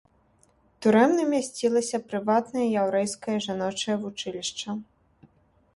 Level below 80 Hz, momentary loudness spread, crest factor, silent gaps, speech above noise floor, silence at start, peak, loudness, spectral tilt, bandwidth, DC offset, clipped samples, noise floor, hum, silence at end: -68 dBFS; 11 LU; 18 dB; none; 38 dB; 0.8 s; -8 dBFS; -26 LUFS; -4.5 dB/octave; 11.5 kHz; under 0.1%; under 0.1%; -63 dBFS; none; 0.95 s